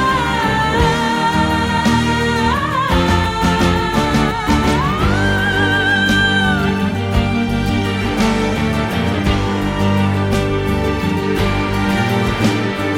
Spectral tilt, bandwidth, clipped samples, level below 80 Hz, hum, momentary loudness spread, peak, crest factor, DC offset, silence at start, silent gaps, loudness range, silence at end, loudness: -5.5 dB/octave; 16.5 kHz; under 0.1%; -26 dBFS; none; 4 LU; -2 dBFS; 14 dB; under 0.1%; 0 s; none; 2 LU; 0 s; -16 LUFS